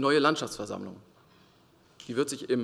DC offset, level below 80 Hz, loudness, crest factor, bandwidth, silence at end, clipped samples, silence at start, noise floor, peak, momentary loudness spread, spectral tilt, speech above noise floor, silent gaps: under 0.1%; -68 dBFS; -30 LUFS; 22 dB; 14 kHz; 0 s; under 0.1%; 0 s; -61 dBFS; -10 dBFS; 18 LU; -4 dB/octave; 33 dB; none